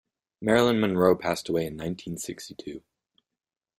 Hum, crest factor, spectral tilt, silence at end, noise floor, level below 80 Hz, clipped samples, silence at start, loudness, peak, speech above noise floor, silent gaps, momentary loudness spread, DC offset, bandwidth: none; 22 dB; -5.5 dB/octave; 1 s; -90 dBFS; -58 dBFS; under 0.1%; 0.4 s; -26 LUFS; -6 dBFS; 64 dB; none; 18 LU; under 0.1%; 16 kHz